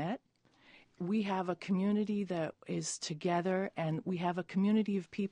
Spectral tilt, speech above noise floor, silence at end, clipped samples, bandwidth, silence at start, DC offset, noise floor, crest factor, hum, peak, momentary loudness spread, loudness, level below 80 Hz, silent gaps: -6 dB/octave; 35 dB; 0.05 s; under 0.1%; 10 kHz; 0 s; under 0.1%; -69 dBFS; 14 dB; none; -20 dBFS; 7 LU; -35 LUFS; -76 dBFS; none